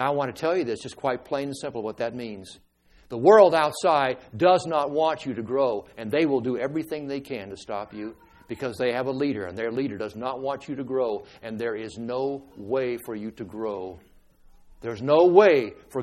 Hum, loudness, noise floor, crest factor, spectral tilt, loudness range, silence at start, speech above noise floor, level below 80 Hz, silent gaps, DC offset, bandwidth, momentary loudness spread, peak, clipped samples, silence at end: none; -25 LUFS; -54 dBFS; 22 dB; -6 dB/octave; 9 LU; 0 s; 29 dB; -62 dBFS; none; under 0.1%; 14.5 kHz; 18 LU; -2 dBFS; under 0.1%; 0 s